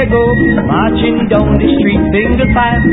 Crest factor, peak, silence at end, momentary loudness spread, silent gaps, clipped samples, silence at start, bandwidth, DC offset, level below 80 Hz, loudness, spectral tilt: 10 dB; 0 dBFS; 0 s; 2 LU; none; under 0.1%; 0 s; 4 kHz; under 0.1%; -20 dBFS; -11 LUFS; -11 dB/octave